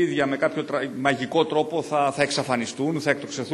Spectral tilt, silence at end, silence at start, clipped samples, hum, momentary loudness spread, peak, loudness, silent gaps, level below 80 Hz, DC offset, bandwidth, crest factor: -4.5 dB/octave; 0 s; 0 s; under 0.1%; none; 4 LU; -4 dBFS; -24 LUFS; none; -66 dBFS; under 0.1%; 12.5 kHz; 20 dB